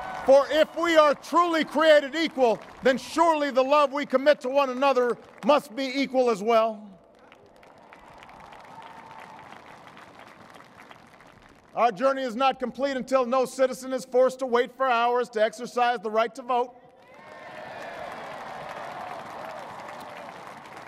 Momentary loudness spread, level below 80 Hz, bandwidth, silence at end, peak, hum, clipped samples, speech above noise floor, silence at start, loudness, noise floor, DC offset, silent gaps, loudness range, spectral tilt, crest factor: 21 LU; -68 dBFS; 15 kHz; 0 s; -6 dBFS; none; under 0.1%; 30 dB; 0 s; -24 LUFS; -53 dBFS; under 0.1%; none; 16 LU; -4 dB/octave; 20 dB